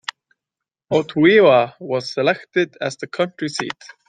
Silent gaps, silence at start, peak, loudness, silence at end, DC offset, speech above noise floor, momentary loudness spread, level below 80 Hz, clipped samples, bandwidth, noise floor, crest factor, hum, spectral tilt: none; 0.9 s; -2 dBFS; -18 LUFS; 0.35 s; under 0.1%; 68 dB; 14 LU; -64 dBFS; under 0.1%; 9.4 kHz; -86 dBFS; 18 dB; none; -5.5 dB/octave